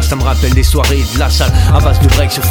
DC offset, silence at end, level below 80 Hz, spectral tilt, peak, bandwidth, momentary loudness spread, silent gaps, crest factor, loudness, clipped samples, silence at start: under 0.1%; 0 s; -12 dBFS; -5 dB/octave; 0 dBFS; 18.5 kHz; 3 LU; none; 10 dB; -11 LUFS; under 0.1%; 0 s